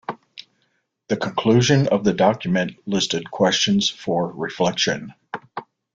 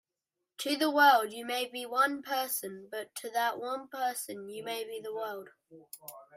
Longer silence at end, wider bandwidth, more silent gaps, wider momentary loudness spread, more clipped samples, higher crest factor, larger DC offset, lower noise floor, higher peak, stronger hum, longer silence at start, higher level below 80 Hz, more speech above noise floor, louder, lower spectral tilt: first, 0.3 s vs 0 s; second, 7.8 kHz vs 16 kHz; neither; about the same, 17 LU vs 18 LU; neither; about the same, 18 dB vs 20 dB; neither; second, -69 dBFS vs -88 dBFS; first, -2 dBFS vs -12 dBFS; neither; second, 0.1 s vs 0.6 s; first, -56 dBFS vs -86 dBFS; second, 49 dB vs 56 dB; first, -20 LUFS vs -31 LUFS; first, -4.5 dB/octave vs -1.5 dB/octave